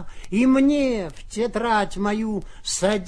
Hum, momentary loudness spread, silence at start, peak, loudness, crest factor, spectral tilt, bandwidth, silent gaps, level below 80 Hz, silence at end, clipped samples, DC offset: none; 11 LU; 0 s; -6 dBFS; -22 LUFS; 14 dB; -4.5 dB/octave; 11 kHz; none; -40 dBFS; 0 s; under 0.1%; under 0.1%